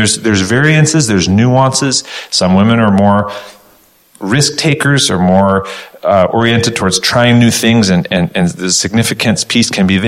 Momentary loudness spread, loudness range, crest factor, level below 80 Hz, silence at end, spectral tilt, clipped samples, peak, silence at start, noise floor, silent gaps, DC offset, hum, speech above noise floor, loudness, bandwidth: 6 LU; 2 LU; 10 dB; -42 dBFS; 0 s; -4.5 dB/octave; under 0.1%; 0 dBFS; 0 s; -47 dBFS; none; 0.2%; none; 37 dB; -10 LUFS; 16 kHz